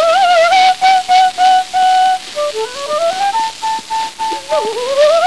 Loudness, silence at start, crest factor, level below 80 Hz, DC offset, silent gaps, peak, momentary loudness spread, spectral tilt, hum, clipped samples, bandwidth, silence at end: -13 LUFS; 0 s; 12 dB; -56 dBFS; 0.8%; none; 0 dBFS; 10 LU; -0.5 dB/octave; none; under 0.1%; 11 kHz; 0 s